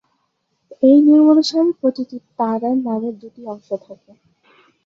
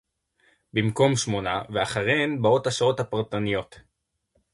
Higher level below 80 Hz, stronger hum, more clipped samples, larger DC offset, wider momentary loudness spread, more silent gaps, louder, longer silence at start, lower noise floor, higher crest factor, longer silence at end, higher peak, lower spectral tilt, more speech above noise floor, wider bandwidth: second, -68 dBFS vs -56 dBFS; neither; neither; neither; first, 19 LU vs 6 LU; neither; first, -15 LUFS vs -24 LUFS; about the same, 0.8 s vs 0.75 s; about the same, -69 dBFS vs -72 dBFS; about the same, 16 dB vs 20 dB; first, 0.9 s vs 0.75 s; first, -2 dBFS vs -6 dBFS; about the same, -6 dB/octave vs -5 dB/octave; first, 53 dB vs 48 dB; second, 7.6 kHz vs 11.5 kHz